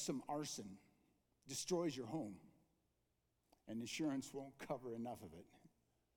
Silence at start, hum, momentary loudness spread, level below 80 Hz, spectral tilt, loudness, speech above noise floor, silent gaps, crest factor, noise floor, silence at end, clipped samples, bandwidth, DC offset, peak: 0 s; none; 17 LU; -80 dBFS; -4.5 dB/octave; -47 LUFS; 39 dB; none; 20 dB; -85 dBFS; 0.5 s; under 0.1%; 19 kHz; under 0.1%; -28 dBFS